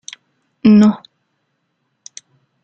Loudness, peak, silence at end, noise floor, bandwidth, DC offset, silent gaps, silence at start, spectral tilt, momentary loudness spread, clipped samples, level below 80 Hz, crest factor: -12 LUFS; -2 dBFS; 1.65 s; -69 dBFS; 7.8 kHz; under 0.1%; none; 0.65 s; -7 dB/octave; 27 LU; under 0.1%; -56 dBFS; 16 dB